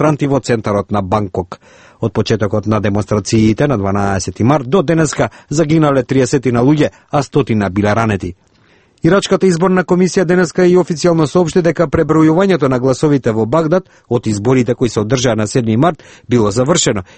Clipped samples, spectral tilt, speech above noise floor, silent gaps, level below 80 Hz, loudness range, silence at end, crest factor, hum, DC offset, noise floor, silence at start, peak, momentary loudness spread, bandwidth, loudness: under 0.1%; -6 dB/octave; 38 dB; none; -40 dBFS; 3 LU; 0.15 s; 12 dB; none; under 0.1%; -50 dBFS; 0 s; 0 dBFS; 6 LU; 8.8 kHz; -13 LUFS